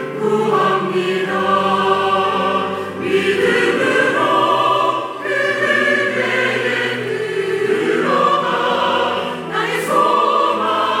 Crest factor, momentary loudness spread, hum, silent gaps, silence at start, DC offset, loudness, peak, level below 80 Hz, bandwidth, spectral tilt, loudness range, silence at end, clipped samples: 14 dB; 6 LU; none; none; 0 s; under 0.1%; -16 LUFS; -2 dBFS; -64 dBFS; 16 kHz; -4.5 dB/octave; 2 LU; 0 s; under 0.1%